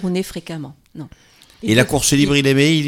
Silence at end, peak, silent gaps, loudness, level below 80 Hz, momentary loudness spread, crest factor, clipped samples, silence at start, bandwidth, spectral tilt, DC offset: 0 s; -2 dBFS; none; -15 LUFS; -42 dBFS; 22 LU; 16 dB; under 0.1%; 0 s; 17 kHz; -4.5 dB/octave; under 0.1%